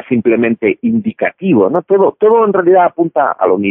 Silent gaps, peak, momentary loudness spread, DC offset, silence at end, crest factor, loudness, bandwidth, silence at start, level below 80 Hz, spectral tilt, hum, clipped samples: none; 0 dBFS; 6 LU; under 0.1%; 0 s; 10 dB; -12 LUFS; 3.6 kHz; 0.1 s; -58 dBFS; -11 dB/octave; none; under 0.1%